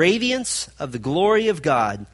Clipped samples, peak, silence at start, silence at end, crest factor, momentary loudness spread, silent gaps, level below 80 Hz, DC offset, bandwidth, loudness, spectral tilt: under 0.1%; -4 dBFS; 0 s; 0.1 s; 18 dB; 9 LU; none; -52 dBFS; under 0.1%; 11.5 kHz; -21 LUFS; -4 dB/octave